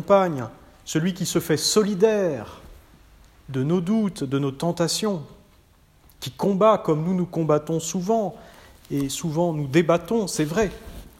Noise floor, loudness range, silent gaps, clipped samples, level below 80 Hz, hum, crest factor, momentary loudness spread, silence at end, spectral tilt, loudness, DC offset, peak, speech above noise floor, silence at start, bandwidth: -56 dBFS; 3 LU; none; under 0.1%; -52 dBFS; none; 18 dB; 13 LU; 0.1 s; -5 dB/octave; -23 LUFS; under 0.1%; -4 dBFS; 34 dB; 0 s; 16 kHz